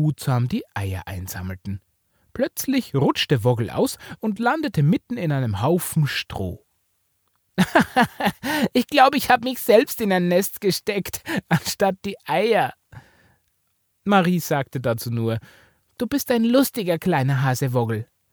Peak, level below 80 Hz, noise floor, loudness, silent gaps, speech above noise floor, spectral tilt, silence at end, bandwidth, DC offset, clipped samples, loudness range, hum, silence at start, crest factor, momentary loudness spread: -2 dBFS; -54 dBFS; -70 dBFS; -22 LUFS; none; 49 dB; -5.5 dB/octave; 0.3 s; over 20 kHz; under 0.1%; under 0.1%; 5 LU; none; 0 s; 18 dB; 13 LU